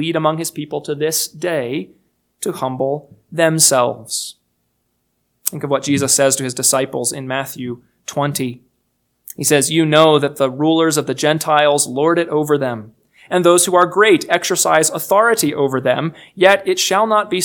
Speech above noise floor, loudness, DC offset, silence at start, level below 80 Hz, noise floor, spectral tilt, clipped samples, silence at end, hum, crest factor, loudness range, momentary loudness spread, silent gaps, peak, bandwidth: 52 dB; -15 LUFS; under 0.1%; 0 s; -64 dBFS; -68 dBFS; -3.5 dB/octave; under 0.1%; 0 s; none; 16 dB; 5 LU; 13 LU; none; 0 dBFS; 19 kHz